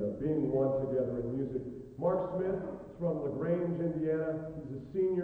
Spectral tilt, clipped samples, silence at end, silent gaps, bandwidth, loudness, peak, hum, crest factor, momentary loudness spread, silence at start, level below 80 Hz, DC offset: -11 dB/octave; under 0.1%; 0 s; none; 4.3 kHz; -34 LUFS; -18 dBFS; none; 14 dB; 9 LU; 0 s; -58 dBFS; under 0.1%